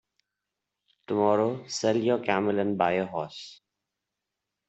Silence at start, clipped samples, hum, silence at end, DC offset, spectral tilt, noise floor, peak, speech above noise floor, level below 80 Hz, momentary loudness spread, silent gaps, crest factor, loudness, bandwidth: 1.1 s; under 0.1%; none; 1.15 s; under 0.1%; -5.5 dB/octave; -86 dBFS; -8 dBFS; 59 dB; -72 dBFS; 12 LU; none; 20 dB; -27 LUFS; 8.2 kHz